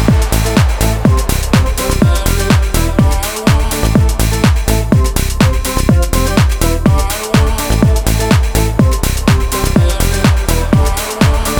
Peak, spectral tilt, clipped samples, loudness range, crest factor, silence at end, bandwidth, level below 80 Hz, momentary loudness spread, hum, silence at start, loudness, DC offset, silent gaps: 0 dBFS; -5 dB/octave; under 0.1%; 0 LU; 10 dB; 0 s; over 20 kHz; -14 dBFS; 2 LU; none; 0 s; -13 LUFS; under 0.1%; none